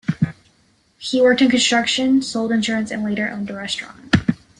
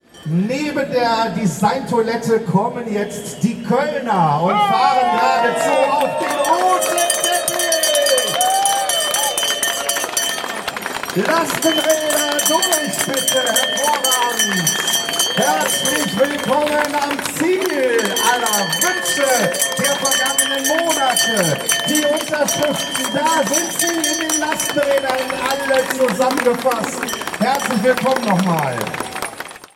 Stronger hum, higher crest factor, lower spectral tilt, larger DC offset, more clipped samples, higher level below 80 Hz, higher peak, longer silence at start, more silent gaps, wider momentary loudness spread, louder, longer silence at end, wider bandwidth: neither; about the same, 18 dB vs 16 dB; first, -4.5 dB/octave vs -2.5 dB/octave; neither; neither; first, -50 dBFS vs -56 dBFS; about the same, -2 dBFS vs 0 dBFS; about the same, 0.1 s vs 0.15 s; neither; first, 11 LU vs 6 LU; second, -19 LUFS vs -16 LUFS; first, 0.25 s vs 0.1 s; second, 11 kHz vs 17 kHz